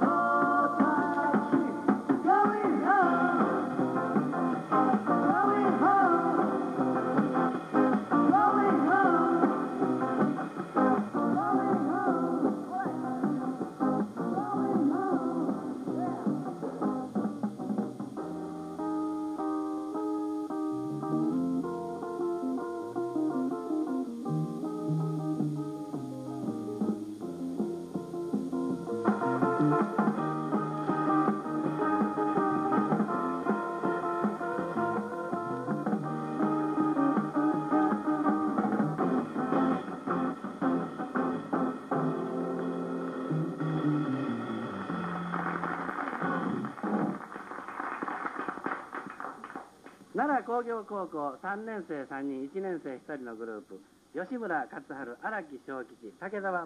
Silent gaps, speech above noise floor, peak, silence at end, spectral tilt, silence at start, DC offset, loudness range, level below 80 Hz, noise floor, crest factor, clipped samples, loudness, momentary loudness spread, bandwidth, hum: none; 17 dB; -10 dBFS; 0 s; -8 dB/octave; 0 s; under 0.1%; 9 LU; -72 dBFS; -53 dBFS; 20 dB; under 0.1%; -30 LUFS; 12 LU; 12 kHz; none